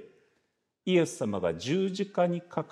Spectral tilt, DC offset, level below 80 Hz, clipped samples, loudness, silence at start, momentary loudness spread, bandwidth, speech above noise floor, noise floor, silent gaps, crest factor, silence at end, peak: -6 dB/octave; under 0.1%; -68 dBFS; under 0.1%; -29 LUFS; 0 s; 5 LU; 13 kHz; 48 dB; -77 dBFS; none; 18 dB; 0.05 s; -12 dBFS